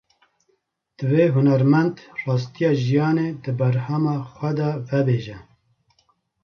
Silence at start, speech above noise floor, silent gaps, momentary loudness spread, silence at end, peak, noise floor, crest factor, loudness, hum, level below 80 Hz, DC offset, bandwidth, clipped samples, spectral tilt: 1 s; 49 dB; none; 9 LU; 1 s; -4 dBFS; -69 dBFS; 16 dB; -21 LUFS; none; -60 dBFS; under 0.1%; 6.6 kHz; under 0.1%; -9 dB/octave